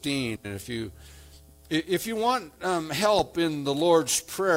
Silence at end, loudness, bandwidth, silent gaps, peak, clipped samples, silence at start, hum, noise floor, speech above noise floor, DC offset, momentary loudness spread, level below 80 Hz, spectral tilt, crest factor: 0 s; -26 LUFS; 16.5 kHz; none; -8 dBFS; under 0.1%; 0.05 s; none; -51 dBFS; 25 dB; under 0.1%; 12 LU; -56 dBFS; -3.5 dB/octave; 18 dB